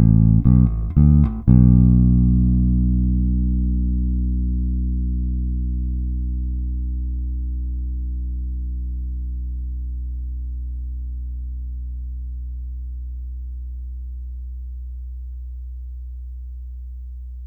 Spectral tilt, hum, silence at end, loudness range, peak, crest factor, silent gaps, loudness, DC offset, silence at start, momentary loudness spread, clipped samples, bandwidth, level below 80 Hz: -14 dB/octave; none; 0 s; 17 LU; -2 dBFS; 18 dB; none; -21 LUFS; under 0.1%; 0 s; 19 LU; under 0.1%; 1.4 kHz; -22 dBFS